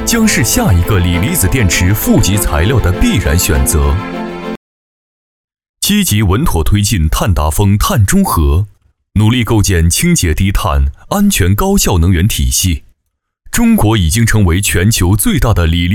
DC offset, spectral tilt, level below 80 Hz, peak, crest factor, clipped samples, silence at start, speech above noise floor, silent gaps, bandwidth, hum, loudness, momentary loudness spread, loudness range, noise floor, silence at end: under 0.1%; -4.5 dB/octave; -20 dBFS; 0 dBFS; 10 dB; under 0.1%; 0 s; 59 dB; 4.57-5.48 s, 5.69-5.74 s; 18 kHz; none; -11 LUFS; 6 LU; 4 LU; -69 dBFS; 0 s